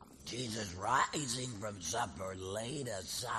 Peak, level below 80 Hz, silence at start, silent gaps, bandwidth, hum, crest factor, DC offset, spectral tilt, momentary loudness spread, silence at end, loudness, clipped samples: -18 dBFS; -64 dBFS; 0 s; none; 13 kHz; none; 20 dB; under 0.1%; -3 dB/octave; 9 LU; 0 s; -38 LUFS; under 0.1%